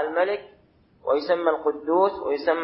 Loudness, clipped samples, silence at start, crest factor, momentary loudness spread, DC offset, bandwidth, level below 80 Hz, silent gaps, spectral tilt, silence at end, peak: -24 LUFS; under 0.1%; 0 s; 18 dB; 5 LU; under 0.1%; 5.8 kHz; -64 dBFS; none; -9 dB/octave; 0 s; -6 dBFS